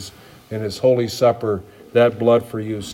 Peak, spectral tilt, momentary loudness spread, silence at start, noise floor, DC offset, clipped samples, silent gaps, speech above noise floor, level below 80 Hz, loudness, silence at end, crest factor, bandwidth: -4 dBFS; -6 dB/octave; 12 LU; 0 s; -40 dBFS; under 0.1%; under 0.1%; none; 22 dB; -58 dBFS; -19 LUFS; 0 s; 16 dB; 16 kHz